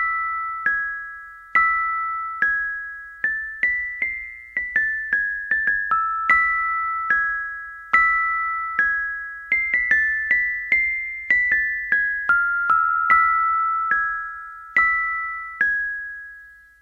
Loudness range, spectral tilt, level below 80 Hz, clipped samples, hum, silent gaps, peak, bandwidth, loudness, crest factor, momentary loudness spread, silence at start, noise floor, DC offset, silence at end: 4 LU; -3 dB/octave; -52 dBFS; under 0.1%; none; none; -2 dBFS; 11 kHz; -20 LUFS; 20 dB; 12 LU; 0 s; -45 dBFS; under 0.1%; 0.25 s